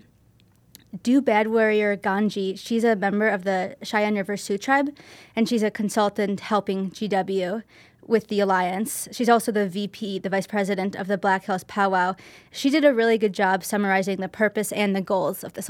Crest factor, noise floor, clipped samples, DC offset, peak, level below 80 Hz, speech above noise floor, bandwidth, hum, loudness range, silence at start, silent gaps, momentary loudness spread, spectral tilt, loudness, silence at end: 20 dB; -58 dBFS; under 0.1%; under 0.1%; -4 dBFS; -68 dBFS; 35 dB; 17 kHz; none; 3 LU; 0.95 s; none; 8 LU; -5 dB/octave; -23 LUFS; 0 s